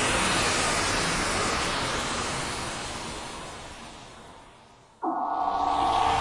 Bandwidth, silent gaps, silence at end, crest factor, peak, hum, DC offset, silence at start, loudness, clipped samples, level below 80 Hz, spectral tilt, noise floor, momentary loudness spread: 11.5 kHz; none; 0 s; 16 dB; -12 dBFS; none; under 0.1%; 0 s; -26 LUFS; under 0.1%; -44 dBFS; -2.5 dB/octave; -53 dBFS; 18 LU